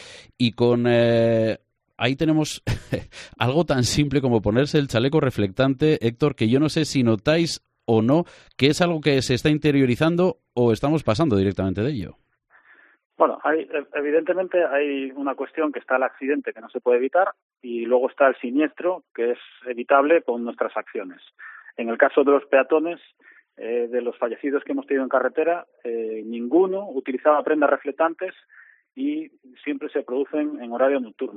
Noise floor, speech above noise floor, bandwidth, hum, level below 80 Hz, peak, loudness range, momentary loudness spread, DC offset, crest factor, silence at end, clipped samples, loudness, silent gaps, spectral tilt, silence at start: -57 dBFS; 35 dB; 14 kHz; none; -50 dBFS; -2 dBFS; 4 LU; 12 LU; under 0.1%; 20 dB; 0 s; under 0.1%; -22 LUFS; 13.05-13.10 s, 17.42-17.49 s, 19.11-19.15 s; -6 dB/octave; 0 s